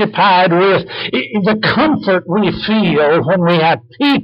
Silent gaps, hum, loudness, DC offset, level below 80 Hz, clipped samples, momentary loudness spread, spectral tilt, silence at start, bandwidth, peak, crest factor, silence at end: none; none; -13 LUFS; under 0.1%; -46 dBFS; under 0.1%; 6 LU; -8.5 dB/octave; 0 s; 5.6 kHz; -4 dBFS; 10 dB; 0 s